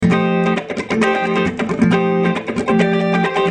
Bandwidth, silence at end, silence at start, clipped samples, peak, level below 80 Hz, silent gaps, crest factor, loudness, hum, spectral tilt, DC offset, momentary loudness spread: 9.8 kHz; 0 s; 0 s; under 0.1%; -2 dBFS; -48 dBFS; none; 14 dB; -16 LUFS; none; -7 dB/octave; under 0.1%; 4 LU